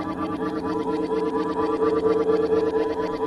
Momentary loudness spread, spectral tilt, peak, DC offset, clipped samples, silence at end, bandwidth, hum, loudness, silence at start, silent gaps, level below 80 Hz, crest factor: 6 LU; -7.5 dB/octave; -10 dBFS; under 0.1%; under 0.1%; 0 s; 11 kHz; none; -24 LUFS; 0 s; none; -52 dBFS; 14 dB